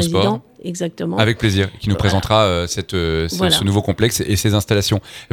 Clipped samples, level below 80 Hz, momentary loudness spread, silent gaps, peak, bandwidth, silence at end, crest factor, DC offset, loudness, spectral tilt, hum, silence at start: under 0.1%; -36 dBFS; 8 LU; none; 0 dBFS; 18.5 kHz; 0.05 s; 18 dB; under 0.1%; -17 LUFS; -5 dB/octave; none; 0 s